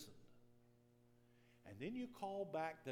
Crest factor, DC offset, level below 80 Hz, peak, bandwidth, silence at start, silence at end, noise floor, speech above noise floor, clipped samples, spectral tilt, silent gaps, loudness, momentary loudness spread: 20 dB; under 0.1%; -82 dBFS; -32 dBFS; 18 kHz; 0 s; 0 s; -72 dBFS; 25 dB; under 0.1%; -6 dB/octave; none; -48 LUFS; 16 LU